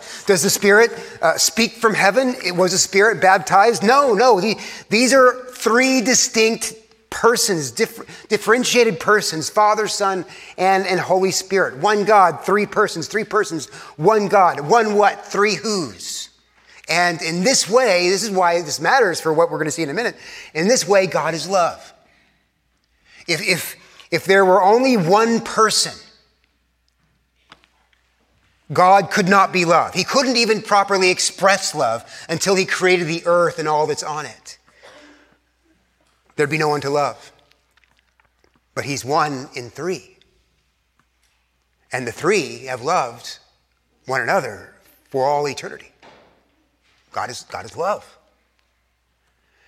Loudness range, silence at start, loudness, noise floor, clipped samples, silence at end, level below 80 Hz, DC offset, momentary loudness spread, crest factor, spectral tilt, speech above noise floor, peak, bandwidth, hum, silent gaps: 11 LU; 0 s; -17 LUFS; -66 dBFS; under 0.1%; 1.65 s; -64 dBFS; under 0.1%; 14 LU; 18 dB; -3 dB/octave; 49 dB; 0 dBFS; 16 kHz; none; none